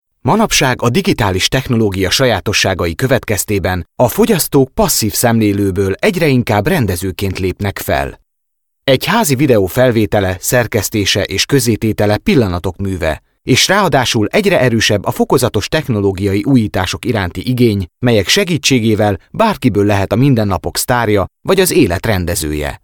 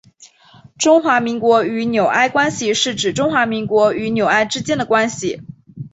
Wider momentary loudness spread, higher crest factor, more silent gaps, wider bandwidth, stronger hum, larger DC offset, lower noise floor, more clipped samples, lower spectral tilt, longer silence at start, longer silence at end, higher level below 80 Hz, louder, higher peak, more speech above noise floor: about the same, 6 LU vs 6 LU; about the same, 12 dB vs 16 dB; neither; first, 19.5 kHz vs 8.2 kHz; neither; neither; first, -73 dBFS vs -47 dBFS; neither; about the same, -4.5 dB/octave vs -3.5 dB/octave; about the same, 0.25 s vs 0.2 s; about the same, 0.05 s vs 0.05 s; first, -36 dBFS vs -54 dBFS; first, -13 LUFS vs -16 LUFS; about the same, 0 dBFS vs 0 dBFS; first, 60 dB vs 31 dB